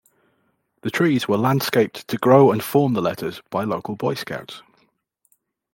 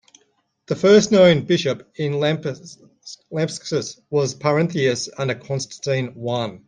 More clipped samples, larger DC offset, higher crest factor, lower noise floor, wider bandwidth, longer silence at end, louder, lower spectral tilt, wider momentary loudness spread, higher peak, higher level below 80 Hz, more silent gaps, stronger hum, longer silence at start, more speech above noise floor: neither; neither; about the same, 18 dB vs 18 dB; about the same, -68 dBFS vs -65 dBFS; first, 17 kHz vs 9.8 kHz; first, 1.15 s vs 0.1 s; about the same, -20 LUFS vs -20 LUFS; first, -6.5 dB/octave vs -5 dB/octave; about the same, 16 LU vs 14 LU; about the same, -2 dBFS vs -2 dBFS; about the same, -64 dBFS vs -60 dBFS; neither; neither; first, 0.85 s vs 0.7 s; about the same, 48 dB vs 45 dB